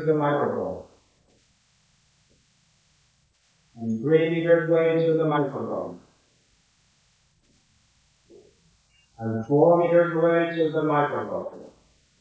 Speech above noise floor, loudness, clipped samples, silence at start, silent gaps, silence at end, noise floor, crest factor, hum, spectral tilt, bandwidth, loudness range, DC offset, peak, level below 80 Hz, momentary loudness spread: 43 dB; -23 LUFS; under 0.1%; 0 s; none; 0.5 s; -65 dBFS; 18 dB; none; -8.5 dB/octave; 8 kHz; 16 LU; under 0.1%; -6 dBFS; -66 dBFS; 15 LU